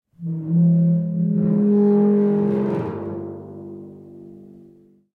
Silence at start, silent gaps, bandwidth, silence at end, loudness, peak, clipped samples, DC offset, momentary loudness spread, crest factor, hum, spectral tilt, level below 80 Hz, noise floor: 0.2 s; none; 2.9 kHz; 0.7 s; -19 LUFS; -10 dBFS; under 0.1%; under 0.1%; 20 LU; 12 dB; none; -12.5 dB/octave; -62 dBFS; -51 dBFS